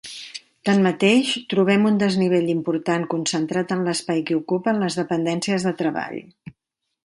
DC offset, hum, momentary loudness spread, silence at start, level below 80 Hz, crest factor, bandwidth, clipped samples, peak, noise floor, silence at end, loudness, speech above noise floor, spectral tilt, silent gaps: under 0.1%; none; 10 LU; 0.05 s; -66 dBFS; 18 dB; 11.5 kHz; under 0.1%; -4 dBFS; -79 dBFS; 0.85 s; -21 LUFS; 58 dB; -5 dB/octave; none